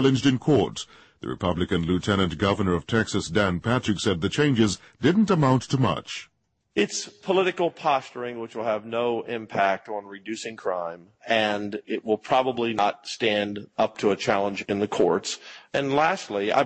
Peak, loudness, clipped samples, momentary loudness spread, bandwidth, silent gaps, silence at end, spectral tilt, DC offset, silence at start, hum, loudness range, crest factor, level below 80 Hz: -8 dBFS; -25 LUFS; under 0.1%; 11 LU; 8.8 kHz; none; 0 s; -5.5 dB/octave; under 0.1%; 0 s; none; 4 LU; 16 dB; -52 dBFS